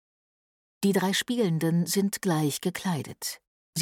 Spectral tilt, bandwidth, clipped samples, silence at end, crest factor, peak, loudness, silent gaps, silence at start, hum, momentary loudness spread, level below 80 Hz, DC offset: -5 dB/octave; 19 kHz; under 0.1%; 0 s; 16 dB; -12 dBFS; -27 LUFS; 3.47-3.73 s; 0.8 s; none; 10 LU; -70 dBFS; under 0.1%